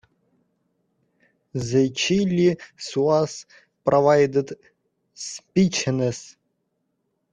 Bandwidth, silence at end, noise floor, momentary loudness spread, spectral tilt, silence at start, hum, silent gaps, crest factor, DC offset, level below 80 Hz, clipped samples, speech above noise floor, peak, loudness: 10 kHz; 1.1 s; -74 dBFS; 17 LU; -5.5 dB/octave; 1.55 s; none; none; 18 dB; under 0.1%; -60 dBFS; under 0.1%; 53 dB; -6 dBFS; -21 LUFS